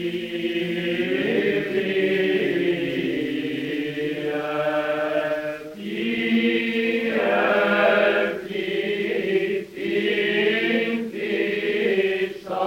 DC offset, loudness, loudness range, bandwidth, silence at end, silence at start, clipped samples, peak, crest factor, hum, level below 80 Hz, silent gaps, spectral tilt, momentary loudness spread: under 0.1%; -23 LUFS; 4 LU; 16 kHz; 0 s; 0 s; under 0.1%; -6 dBFS; 16 dB; none; -62 dBFS; none; -6 dB/octave; 7 LU